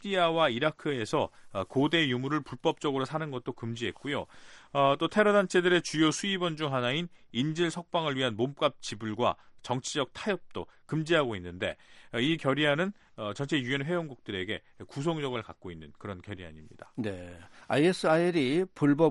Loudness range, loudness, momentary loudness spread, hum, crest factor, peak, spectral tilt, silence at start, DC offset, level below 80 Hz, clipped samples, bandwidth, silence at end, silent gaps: 7 LU; -30 LUFS; 16 LU; none; 18 dB; -12 dBFS; -5 dB/octave; 0 s; under 0.1%; -66 dBFS; under 0.1%; 11.5 kHz; 0 s; none